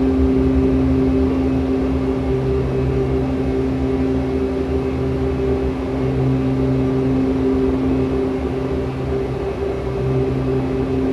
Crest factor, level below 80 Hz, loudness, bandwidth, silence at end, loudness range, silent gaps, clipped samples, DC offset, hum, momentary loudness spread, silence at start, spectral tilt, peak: 14 dB; -28 dBFS; -19 LUFS; 7.4 kHz; 0 s; 2 LU; none; under 0.1%; 0.1%; none; 5 LU; 0 s; -9 dB/octave; -4 dBFS